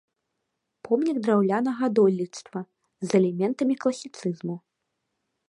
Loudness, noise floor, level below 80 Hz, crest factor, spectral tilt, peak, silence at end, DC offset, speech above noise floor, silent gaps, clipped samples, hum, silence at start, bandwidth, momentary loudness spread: -25 LUFS; -80 dBFS; -76 dBFS; 18 dB; -7 dB/octave; -8 dBFS; 0.9 s; under 0.1%; 56 dB; none; under 0.1%; none; 0.85 s; 11 kHz; 15 LU